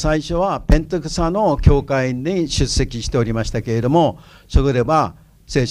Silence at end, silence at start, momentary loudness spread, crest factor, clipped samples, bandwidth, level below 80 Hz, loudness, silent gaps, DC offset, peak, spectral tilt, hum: 0 s; 0 s; 6 LU; 18 dB; under 0.1%; 11.5 kHz; -24 dBFS; -18 LUFS; none; under 0.1%; 0 dBFS; -6 dB/octave; none